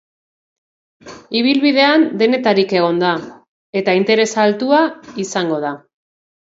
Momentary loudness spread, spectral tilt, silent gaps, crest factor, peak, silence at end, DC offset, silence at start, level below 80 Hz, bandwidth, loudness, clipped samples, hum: 11 LU; -4.5 dB/octave; 3.48-3.73 s; 16 dB; 0 dBFS; 0.75 s; under 0.1%; 1.05 s; -66 dBFS; 7.8 kHz; -15 LUFS; under 0.1%; none